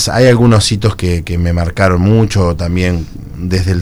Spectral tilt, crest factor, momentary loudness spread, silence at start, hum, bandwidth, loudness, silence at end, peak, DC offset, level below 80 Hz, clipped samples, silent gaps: -6 dB/octave; 12 dB; 9 LU; 0 s; none; over 20 kHz; -12 LUFS; 0 s; 0 dBFS; under 0.1%; -26 dBFS; 0.5%; none